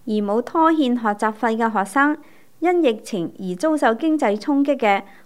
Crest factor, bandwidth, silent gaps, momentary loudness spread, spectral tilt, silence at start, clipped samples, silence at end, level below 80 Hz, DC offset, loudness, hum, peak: 16 dB; 14 kHz; none; 7 LU; -5.5 dB/octave; 0.05 s; under 0.1%; 0.2 s; -72 dBFS; 0.5%; -20 LUFS; none; -4 dBFS